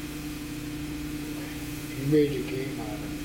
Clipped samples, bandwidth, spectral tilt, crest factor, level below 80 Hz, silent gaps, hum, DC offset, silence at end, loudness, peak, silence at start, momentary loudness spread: under 0.1%; 17 kHz; -6 dB/octave; 18 dB; -46 dBFS; none; 60 Hz at -50 dBFS; under 0.1%; 0 s; -31 LUFS; -12 dBFS; 0 s; 12 LU